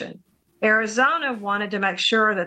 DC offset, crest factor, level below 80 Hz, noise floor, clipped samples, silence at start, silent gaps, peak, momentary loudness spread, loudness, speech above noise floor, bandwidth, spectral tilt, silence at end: under 0.1%; 16 dB; -70 dBFS; -51 dBFS; under 0.1%; 0 s; none; -6 dBFS; 6 LU; -21 LUFS; 30 dB; 9.2 kHz; -3 dB/octave; 0 s